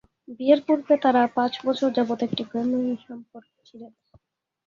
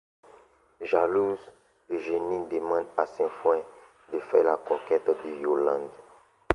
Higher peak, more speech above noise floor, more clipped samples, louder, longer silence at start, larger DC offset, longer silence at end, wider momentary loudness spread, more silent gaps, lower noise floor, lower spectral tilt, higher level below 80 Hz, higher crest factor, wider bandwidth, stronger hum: about the same, -6 dBFS vs -4 dBFS; first, 39 dB vs 31 dB; neither; first, -23 LUFS vs -28 LUFS; second, 0.3 s vs 0.8 s; neither; first, 0.8 s vs 0 s; about the same, 10 LU vs 12 LU; neither; first, -63 dBFS vs -57 dBFS; about the same, -6.5 dB/octave vs -7 dB/octave; second, -68 dBFS vs -62 dBFS; about the same, 20 dB vs 24 dB; second, 7.4 kHz vs 10.5 kHz; neither